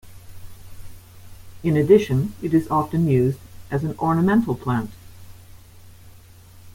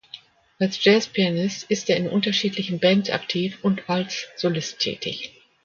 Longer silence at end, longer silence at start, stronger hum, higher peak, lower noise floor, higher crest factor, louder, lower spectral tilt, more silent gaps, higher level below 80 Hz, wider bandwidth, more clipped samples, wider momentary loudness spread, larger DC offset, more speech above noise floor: second, 0.05 s vs 0.35 s; about the same, 0.05 s vs 0.15 s; neither; about the same, -4 dBFS vs -4 dBFS; about the same, -46 dBFS vs -46 dBFS; about the same, 20 dB vs 20 dB; about the same, -21 LUFS vs -23 LUFS; first, -8.5 dB/octave vs -4.5 dB/octave; neither; first, -48 dBFS vs -66 dBFS; first, 16.5 kHz vs 7.2 kHz; neither; about the same, 11 LU vs 11 LU; neither; about the same, 26 dB vs 24 dB